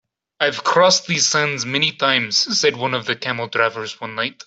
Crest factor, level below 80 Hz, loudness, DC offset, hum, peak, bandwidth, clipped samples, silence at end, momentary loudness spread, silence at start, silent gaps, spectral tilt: 20 dB; -64 dBFS; -18 LUFS; under 0.1%; none; 0 dBFS; 8.2 kHz; under 0.1%; 0.15 s; 8 LU; 0.4 s; none; -2 dB/octave